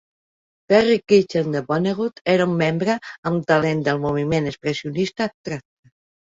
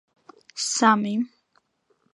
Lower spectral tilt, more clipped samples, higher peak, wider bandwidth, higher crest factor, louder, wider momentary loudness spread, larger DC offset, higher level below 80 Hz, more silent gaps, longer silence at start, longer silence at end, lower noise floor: first, -6.5 dB/octave vs -3 dB/octave; neither; about the same, -2 dBFS vs -4 dBFS; second, 7.8 kHz vs 11.5 kHz; about the same, 18 dB vs 22 dB; first, -20 LUFS vs -23 LUFS; second, 9 LU vs 15 LU; neither; first, -54 dBFS vs -82 dBFS; first, 2.21-2.25 s, 3.18-3.23 s, 5.34-5.44 s vs none; first, 0.7 s vs 0.55 s; second, 0.7 s vs 0.9 s; first, under -90 dBFS vs -69 dBFS